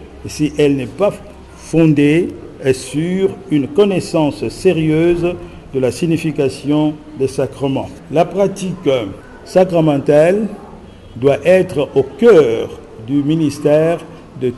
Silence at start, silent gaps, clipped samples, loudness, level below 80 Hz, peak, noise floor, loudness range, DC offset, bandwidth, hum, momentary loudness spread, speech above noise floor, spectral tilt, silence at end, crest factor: 0 s; none; under 0.1%; -15 LUFS; -42 dBFS; -2 dBFS; -36 dBFS; 4 LU; under 0.1%; 12.5 kHz; none; 12 LU; 22 dB; -7 dB/octave; 0 s; 14 dB